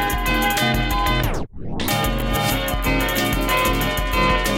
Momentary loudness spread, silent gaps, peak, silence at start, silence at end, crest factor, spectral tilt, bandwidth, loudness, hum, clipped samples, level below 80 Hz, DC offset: 4 LU; none; -6 dBFS; 0 s; 0 s; 14 dB; -4 dB/octave; 17 kHz; -20 LUFS; none; under 0.1%; -26 dBFS; under 0.1%